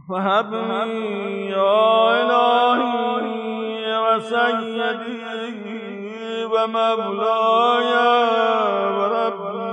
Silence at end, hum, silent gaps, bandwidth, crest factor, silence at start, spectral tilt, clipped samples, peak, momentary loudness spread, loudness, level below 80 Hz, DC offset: 0 s; none; none; 9 kHz; 14 dB; 0.05 s; -5.5 dB/octave; under 0.1%; -6 dBFS; 12 LU; -19 LUFS; -78 dBFS; under 0.1%